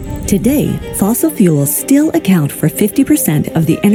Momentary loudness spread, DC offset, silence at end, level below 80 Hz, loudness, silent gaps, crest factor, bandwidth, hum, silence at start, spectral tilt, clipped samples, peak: 4 LU; under 0.1%; 0 s; -34 dBFS; -12 LUFS; none; 12 dB; 19.5 kHz; none; 0 s; -6 dB/octave; under 0.1%; 0 dBFS